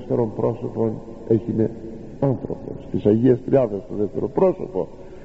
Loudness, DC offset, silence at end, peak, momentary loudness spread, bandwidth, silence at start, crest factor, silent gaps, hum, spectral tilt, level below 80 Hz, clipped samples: -22 LUFS; under 0.1%; 0 s; -4 dBFS; 14 LU; 7.6 kHz; 0 s; 18 dB; none; none; -10 dB/octave; -46 dBFS; under 0.1%